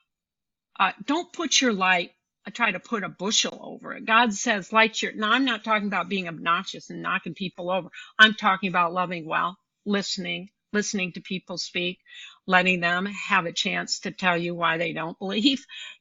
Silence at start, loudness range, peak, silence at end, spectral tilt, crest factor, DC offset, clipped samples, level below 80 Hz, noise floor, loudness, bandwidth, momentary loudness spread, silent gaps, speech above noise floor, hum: 0.8 s; 3 LU; -2 dBFS; 0.1 s; -3 dB/octave; 24 dB; under 0.1%; under 0.1%; -70 dBFS; -88 dBFS; -24 LUFS; 8.2 kHz; 13 LU; none; 63 dB; none